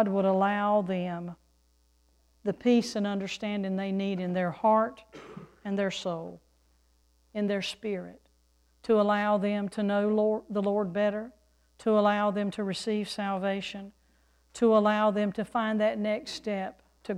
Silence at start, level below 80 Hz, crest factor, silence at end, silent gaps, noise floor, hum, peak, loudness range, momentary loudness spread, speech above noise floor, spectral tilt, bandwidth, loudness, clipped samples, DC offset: 0 s; -66 dBFS; 18 dB; 0 s; none; -67 dBFS; none; -12 dBFS; 4 LU; 16 LU; 39 dB; -6 dB/octave; 11.5 kHz; -29 LUFS; under 0.1%; under 0.1%